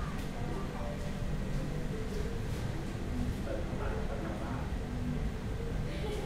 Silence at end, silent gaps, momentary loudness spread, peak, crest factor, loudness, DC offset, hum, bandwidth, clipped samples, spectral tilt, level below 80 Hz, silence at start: 0 s; none; 2 LU; -22 dBFS; 14 dB; -38 LUFS; under 0.1%; none; 15.5 kHz; under 0.1%; -6.5 dB/octave; -40 dBFS; 0 s